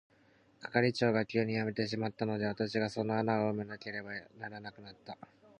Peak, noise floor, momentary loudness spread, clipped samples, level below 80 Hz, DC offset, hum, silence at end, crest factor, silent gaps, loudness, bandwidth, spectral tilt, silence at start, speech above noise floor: -14 dBFS; -66 dBFS; 18 LU; under 0.1%; -70 dBFS; under 0.1%; none; 0.45 s; 22 dB; none; -34 LUFS; 9.6 kHz; -6.5 dB/octave; 0.6 s; 32 dB